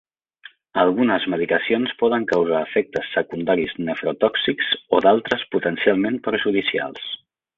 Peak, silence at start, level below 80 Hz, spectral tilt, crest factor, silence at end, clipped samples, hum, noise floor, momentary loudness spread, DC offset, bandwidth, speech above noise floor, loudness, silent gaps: -2 dBFS; 0.75 s; -60 dBFS; -6.5 dB/octave; 18 dB; 0.4 s; under 0.1%; none; -48 dBFS; 7 LU; under 0.1%; 7.4 kHz; 28 dB; -21 LUFS; none